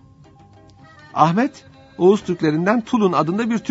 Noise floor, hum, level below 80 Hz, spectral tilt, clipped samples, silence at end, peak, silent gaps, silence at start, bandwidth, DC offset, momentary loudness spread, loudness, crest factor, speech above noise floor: -47 dBFS; none; -58 dBFS; -7 dB/octave; under 0.1%; 0 s; 0 dBFS; none; 1.15 s; 8 kHz; under 0.1%; 5 LU; -18 LUFS; 20 dB; 30 dB